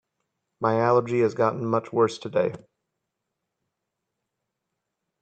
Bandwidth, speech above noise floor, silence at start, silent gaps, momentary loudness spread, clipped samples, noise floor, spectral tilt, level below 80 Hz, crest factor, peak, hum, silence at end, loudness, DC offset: 8.8 kHz; 59 dB; 0.6 s; none; 5 LU; under 0.1%; -82 dBFS; -7 dB/octave; -70 dBFS; 20 dB; -6 dBFS; none; 2.65 s; -24 LUFS; under 0.1%